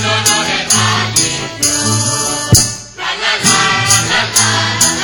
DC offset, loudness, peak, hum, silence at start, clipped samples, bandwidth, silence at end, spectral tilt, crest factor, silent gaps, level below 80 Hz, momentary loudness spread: under 0.1%; -11 LUFS; 0 dBFS; none; 0 s; 0.2%; over 20 kHz; 0 s; -2 dB/octave; 14 dB; none; -36 dBFS; 5 LU